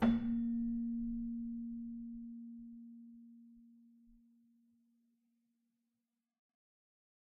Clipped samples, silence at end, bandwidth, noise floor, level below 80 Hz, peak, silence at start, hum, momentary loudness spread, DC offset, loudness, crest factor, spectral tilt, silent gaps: under 0.1%; 3.2 s; 4.2 kHz; -89 dBFS; -60 dBFS; -22 dBFS; 0 s; none; 21 LU; under 0.1%; -41 LUFS; 22 dB; -7 dB/octave; none